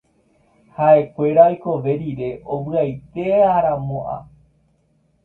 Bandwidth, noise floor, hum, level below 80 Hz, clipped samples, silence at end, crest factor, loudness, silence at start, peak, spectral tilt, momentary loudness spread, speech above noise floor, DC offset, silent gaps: 4.1 kHz; -62 dBFS; none; -52 dBFS; under 0.1%; 1 s; 18 dB; -18 LUFS; 0.8 s; 0 dBFS; -10.5 dB/octave; 13 LU; 44 dB; under 0.1%; none